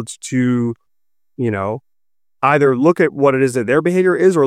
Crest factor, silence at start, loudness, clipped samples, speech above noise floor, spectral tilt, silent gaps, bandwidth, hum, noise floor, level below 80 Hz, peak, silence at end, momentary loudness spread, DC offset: 14 dB; 0 s; -16 LUFS; under 0.1%; 73 dB; -6.5 dB/octave; none; 13.5 kHz; none; -88 dBFS; -64 dBFS; -2 dBFS; 0 s; 10 LU; under 0.1%